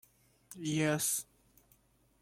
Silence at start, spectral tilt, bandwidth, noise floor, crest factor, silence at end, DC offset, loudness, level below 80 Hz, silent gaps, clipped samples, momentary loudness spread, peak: 0.5 s; -3.5 dB/octave; 16.5 kHz; -69 dBFS; 18 dB; 1 s; under 0.1%; -33 LUFS; -72 dBFS; none; under 0.1%; 23 LU; -20 dBFS